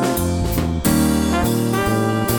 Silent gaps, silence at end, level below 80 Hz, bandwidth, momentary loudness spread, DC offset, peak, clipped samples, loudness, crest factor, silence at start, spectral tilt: none; 0 s; -30 dBFS; over 20 kHz; 3 LU; under 0.1%; -4 dBFS; under 0.1%; -18 LUFS; 14 dB; 0 s; -5.5 dB/octave